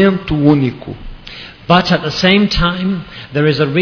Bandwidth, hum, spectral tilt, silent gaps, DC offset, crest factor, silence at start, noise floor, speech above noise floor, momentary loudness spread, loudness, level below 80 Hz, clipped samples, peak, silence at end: 5.4 kHz; none; -6.5 dB/octave; none; under 0.1%; 14 dB; 0 s; -33 dBFS; 20 dB; 19 LU; -13 LUFS; -32 dBFS; under 0.1%; 0 dBFS; 0 s